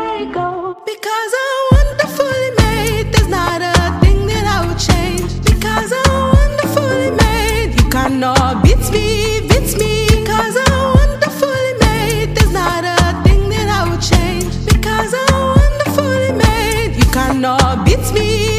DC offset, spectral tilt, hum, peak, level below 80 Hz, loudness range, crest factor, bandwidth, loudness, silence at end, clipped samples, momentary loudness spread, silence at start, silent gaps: under 0.1%; -5 dB/octave; none; 0 dBFS; -18 dBFS; 1 LU; 12 dB; 15.5 kHz; -14 LUFS; 0 s; under 0.1%; 4 LU; 0 s; none